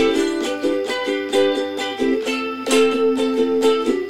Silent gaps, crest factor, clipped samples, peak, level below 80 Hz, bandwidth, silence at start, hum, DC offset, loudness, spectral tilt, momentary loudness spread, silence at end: none; 14 dB; under 0.1%; -4 dBFS; -56 dBFS; 16 kHz; 0 s; none; 0.6%; -19 LUFS; -3 dB/octave; 5 LU; 0 s